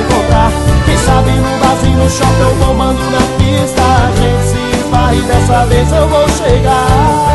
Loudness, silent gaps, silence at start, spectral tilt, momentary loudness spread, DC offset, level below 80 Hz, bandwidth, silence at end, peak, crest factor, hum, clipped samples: -10 LUFS; none; 0 s; -5.5 dB/octave; 3 LU; under 0.1%; -16 dBFS; 12.5 kHz; 0 s; 0 dBFS; 8 dB; none; under 0.1%